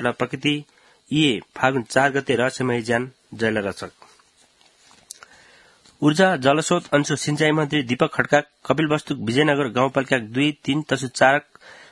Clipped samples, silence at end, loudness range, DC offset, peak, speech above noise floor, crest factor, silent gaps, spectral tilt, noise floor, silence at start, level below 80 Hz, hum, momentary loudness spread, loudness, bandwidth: under 0.1%; 0.2 s; 6 LU; under 0.1%; 0 dBFS; 36 dB; 22 dB; none; -5 dB/octave; -57 dBFS; 0 s; -60 dBFS; none; 8 LU; -21 LUFS; 12 kHz